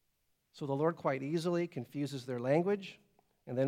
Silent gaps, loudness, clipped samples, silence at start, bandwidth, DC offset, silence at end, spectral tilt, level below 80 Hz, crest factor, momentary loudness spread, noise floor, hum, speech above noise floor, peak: none; -35 LUFS; under 0.1%; 0.55 s; 15.5 kHz; under 0.1%; 0 s; -7 dB/octave; -84 dBFS; 18 dB; 9 LU; -78 dBFS; none; 44 dB; -16 dBFS